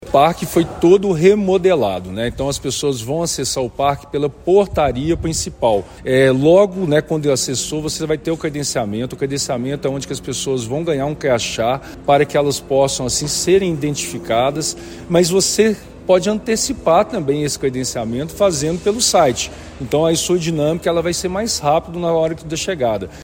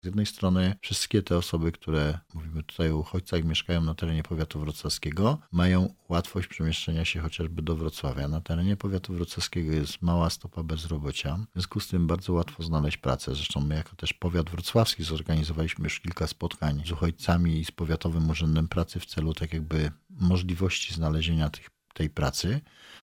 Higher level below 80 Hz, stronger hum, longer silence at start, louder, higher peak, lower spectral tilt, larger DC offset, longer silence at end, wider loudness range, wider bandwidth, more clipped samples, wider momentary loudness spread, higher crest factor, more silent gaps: about the same, -40 dBFS vs -38 dBFS; neither; about the same, 0 s vs 0.05 s; first, -17 LUFS vs -29 LUFS; first, 0 dBFS vs -10 dBFS; about the same, -4.5 dB/octave vs -5.5 dB/octave; neither; about the same, 0 s vs 0.05 s; about the same, 4 LU vs 2 LU; about the same, 16.5 kHz vs 16.5 kHz; neither; about the same, 8 LU vs 7 LU; about the same, 16 dB vs 18 dB; neither